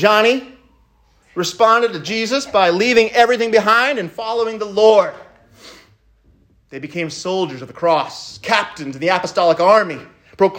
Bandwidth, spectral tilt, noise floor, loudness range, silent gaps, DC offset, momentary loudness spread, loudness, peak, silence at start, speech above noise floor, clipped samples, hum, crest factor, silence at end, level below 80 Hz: 16 kHz; -4 dB/octave; -55 dBFS; 7 LU; none; under 0.1%; 13 LU; -16 LUFS; 0 dBFS; 0 s; 39 dB; under 0.1%; none; 16 dB; 0 s; -58 dBFS